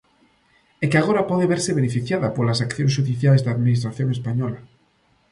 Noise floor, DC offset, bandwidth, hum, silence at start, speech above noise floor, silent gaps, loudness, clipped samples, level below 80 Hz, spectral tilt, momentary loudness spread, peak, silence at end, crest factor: -62 dBFS; under 0.1%; 11.5 kHz; none; 0.8 s; 42 dB; none; -21 LUFS; under 0.1%; -56 dBFS; -6.5 dB/octave; 7 LU; -2 dBFS; 0.65 s; 18 dB